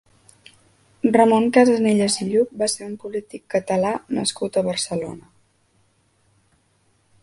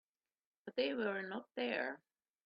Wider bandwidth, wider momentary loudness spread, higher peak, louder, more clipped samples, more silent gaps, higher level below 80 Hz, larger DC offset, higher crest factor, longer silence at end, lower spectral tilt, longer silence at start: first, 11.5 kHz vs 5.6 kHz; about the same, 14 LU vs 12 LU; first, 0 dBFS vs -24 dBFS; first, -20 LUFS vs -40 LUFS; neither; neither; first, -62 dBFS vs -86 dBFS; neither; about the same, 22 dB vs 18 dB; first, 2 s vs 0.5 s; first, -4.5 dB/octave vs -2 dB/octave; first, 1.05 s vs 0.65 s